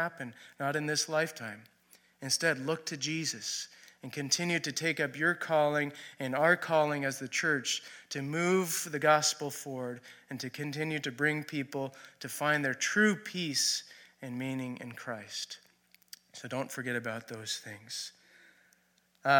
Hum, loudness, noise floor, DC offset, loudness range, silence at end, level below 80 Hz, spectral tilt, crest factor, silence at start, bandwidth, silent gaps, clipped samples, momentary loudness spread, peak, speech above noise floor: none; -32 LUFS; -70 dBFS; under 0.1%; 9 LU; 0 s; -84 dBFS; -3 dB/octave; 22 dB; 0 s; 17.5 kHz; none; under 0.1%; 16 LU; -10 dBFS; 37 dB